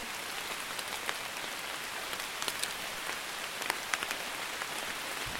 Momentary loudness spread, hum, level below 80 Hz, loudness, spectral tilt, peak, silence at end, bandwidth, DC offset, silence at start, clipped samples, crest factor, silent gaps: 4 LU; none; -64 dBFS; -35 LUFS; -0.5 dB/octave; -8 dBFS; 0 s; 16.5 kHz; under 0.1%; 0 s; under 0.1%; 30 dB; none